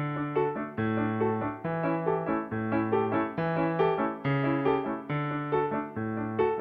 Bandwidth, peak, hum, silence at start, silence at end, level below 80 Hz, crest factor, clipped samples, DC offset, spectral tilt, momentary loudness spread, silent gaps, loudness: 5.2 kHz; -14 dBFS; none; 0 s; 0 s; -62 dBFS; 16 dB; under 0.1%; under 0.1%; -10 dB/octave; 5 LU; none; -29 LUFS